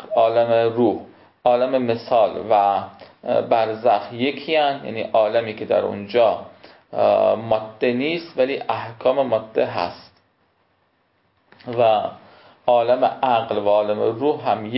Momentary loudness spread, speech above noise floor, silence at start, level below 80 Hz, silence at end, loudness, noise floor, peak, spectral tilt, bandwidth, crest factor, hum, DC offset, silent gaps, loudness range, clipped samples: 9 LU; 45 dB; 0 s; -62 dBFS; 0 s; -20 LUFS; -65 dBFS; -4 dBFS; -10 dB/octave; 5.8 kHz; 16 dB; none; under 0.1%; none; 4 LU; under 0.1%